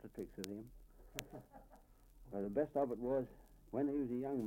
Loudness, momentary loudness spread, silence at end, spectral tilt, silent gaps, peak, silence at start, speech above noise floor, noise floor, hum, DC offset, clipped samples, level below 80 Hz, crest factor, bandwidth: -42 LUFS; 18 LU; 0 s; -6.5 dB/octave; none; -18 dBFS; 0.05 s; 22 dB; -63 dBFS; none; under 0.1%; under 0.1%; -64 dBFS; 24 dB; 16.5 kHz